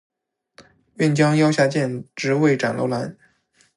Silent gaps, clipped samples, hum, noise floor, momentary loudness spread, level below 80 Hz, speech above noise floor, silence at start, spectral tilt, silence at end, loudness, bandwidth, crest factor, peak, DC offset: none; under 0.1%; none; -61 dBFS; 10 LU; -66 dBFS; 42 dB; 0.6 s; -6 dB/octave; 0.65 s; -20 LUFS; 11.5 kHz; 18 dB; -4 dBFS; under 0.1%